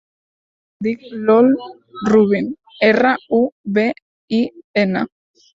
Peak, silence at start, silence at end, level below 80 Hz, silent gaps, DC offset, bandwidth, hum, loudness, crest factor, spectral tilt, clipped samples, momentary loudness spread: -2 dBFS; 0.8 s; 0.55 s; -58 dBFS; 3.52-3.64 s, 4.02-4.28 s, 4.64-4.74 s; under 0.1%; 7.6 kHz; none; -17 LUFS; 16 dB; -7 dB/octave; under 0.1%; 12 LU